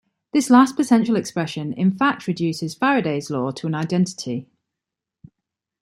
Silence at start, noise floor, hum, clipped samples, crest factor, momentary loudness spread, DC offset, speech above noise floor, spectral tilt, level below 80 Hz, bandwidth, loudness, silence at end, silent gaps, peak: 0.35 s; -85 dBFS; none; under 0.1%; 18 dB; 11 LU; under 0.1%; 66 dB; -5.5 dB/octave; -66 dBFS; 13.5 kHz; -20 LUFS; 1.4 s; none; -2 dBFS